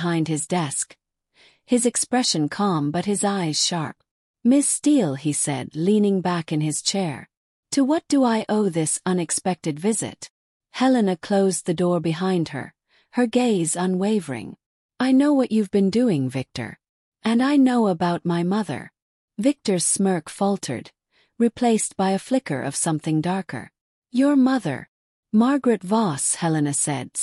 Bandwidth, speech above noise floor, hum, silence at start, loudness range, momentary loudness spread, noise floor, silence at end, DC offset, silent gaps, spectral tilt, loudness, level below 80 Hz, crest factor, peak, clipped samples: 13.5 kHz; 37 dB; none; 0 s; 2 LU; 11 LU; -58 dBFS; 0 s; under 0.1%; 4.11-4.34 s, 7.37-7.63 s, 10.30-10.60 s, 14.66-14.89 s, 16.89-17.12 s, 19.02-19.28 s, 23.81-24.02 s, 24.88-25.23 s; -4.5 dB/octave; -22 LUFS; -66 dBFS; 14 dB; -8 dBFS; under 0.1%